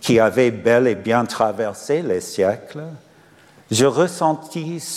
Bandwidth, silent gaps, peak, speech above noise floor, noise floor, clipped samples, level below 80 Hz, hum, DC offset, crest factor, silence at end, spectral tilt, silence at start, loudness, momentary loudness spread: 16 kHz; none; -4 dBFS; 31 dB; -50 dBFS; under 0.1%; -60 dBFS; none; under 0.1%; 16 dB; 0 s; -5 dB/octave; 0 s; -19 LUFS; 12 LU